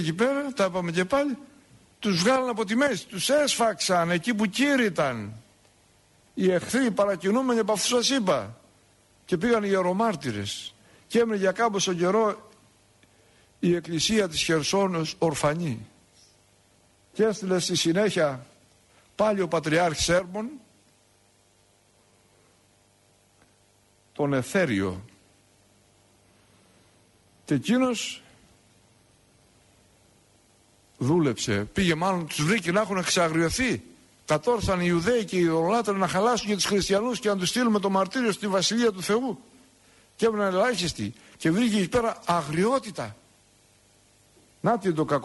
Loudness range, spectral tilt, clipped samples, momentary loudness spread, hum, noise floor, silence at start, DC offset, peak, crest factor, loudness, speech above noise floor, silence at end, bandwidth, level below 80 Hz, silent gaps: 7 LU; -4.5 dB/octave; under 0.1%; 9 LU; none; -62 dBFS; 0 s; under 0.1%; -10 dBFS; 16 dB; -25 LUFS; 38 dB; 0 s; 11.5 kHz; -54 dBFS; none